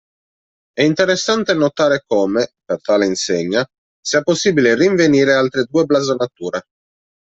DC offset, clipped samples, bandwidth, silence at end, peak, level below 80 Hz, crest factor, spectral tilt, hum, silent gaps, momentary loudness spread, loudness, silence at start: under 0.1%; under 0.1%; 8.2 kHz; 0.6 s; -2 dBFS; -58 dBFS; 14 dB; -4.5 dB/octave; none; 3.78-4.03 s; 10 LU; -16 LUFS; 0.75 s